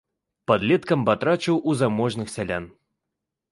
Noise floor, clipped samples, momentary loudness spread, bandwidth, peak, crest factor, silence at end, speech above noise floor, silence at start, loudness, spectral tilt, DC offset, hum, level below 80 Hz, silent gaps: -83 dBFS; under 0.1%; 9 LU; 11.5 kHz; -4 dBFS; 20 dB; 0.8 s; 61 dB; 0.5 s; -23 LUFS; -6 dB/octave; under 0.1%; none; -56 dBFS; none